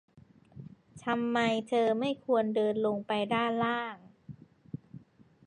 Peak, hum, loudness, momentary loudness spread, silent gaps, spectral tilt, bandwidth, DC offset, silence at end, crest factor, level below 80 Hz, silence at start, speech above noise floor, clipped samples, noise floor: -16 dBFS; none; -30 LUFS; 22 LU; none; -6 dB/octave; 10 kHz; under 0.1%; 0.5 s; 16 dB; -72 dBFS; 0.15 s; 27 dB; under 0.1%; -56 dBFS